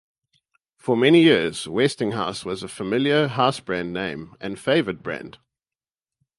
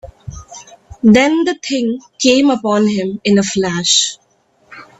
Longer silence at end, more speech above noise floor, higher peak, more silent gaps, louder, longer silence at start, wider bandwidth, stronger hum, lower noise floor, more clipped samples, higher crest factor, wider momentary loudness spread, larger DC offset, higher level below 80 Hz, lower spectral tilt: first, 1.1 s vs 0.15 s; first, over 69 dB vs 35 dB; about the same, -2 dBFS vs 0 dBFS; neither; second, -21 LUFS vs -13 LUFS; first, 0.85 s vs 0.05 s; first, 11.5 kHz vs 8.4 kHz; neither; first, under -90 dBFS vs -49 dBFS; neither; about the same, 20 dB vs 16 dB; first, 17 LU vs 14 LU; neither; second, -58 dBFS vs -46 dBFS; first, -5.5 dB/octave vs -3.5 dB/octave